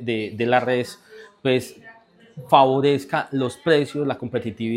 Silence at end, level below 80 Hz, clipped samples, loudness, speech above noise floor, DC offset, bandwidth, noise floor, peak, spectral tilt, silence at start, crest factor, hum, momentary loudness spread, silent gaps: 0 s; -64 dBFS; under 0.1%; -21 LUFS; 28 dB; under 0.1%; 16 kHz; -49 dBFS; 0 dBFS; -6 dB/octave; 0 s; 22 dB; none; 11 LU; none